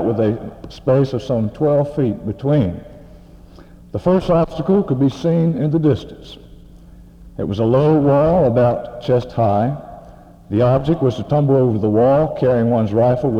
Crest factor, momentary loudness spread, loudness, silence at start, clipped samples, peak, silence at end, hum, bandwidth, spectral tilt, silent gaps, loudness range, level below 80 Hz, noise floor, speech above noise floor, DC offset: 14 dB; 11 LU; -17 LUFS; 0 s; under 0.1%; -2 dBFS; 0 s; none; 8.2 kHz; -9.5 dB/octave; none; 3 LU; -42 dBFS; -41 dBFS; 25 dB; under 0.1%